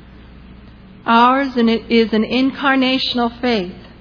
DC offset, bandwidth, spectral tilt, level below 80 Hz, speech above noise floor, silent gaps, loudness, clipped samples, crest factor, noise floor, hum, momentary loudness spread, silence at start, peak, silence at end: under 0.1%; 5.4 kHz; -6 dB/octave; -44 dBFS; 25 dB; none; -15 LUFS; under 0.1%; 16 dB; -40 dBFS; none; 7 LU; 0.35 s; 0 dBFS; 0.2 s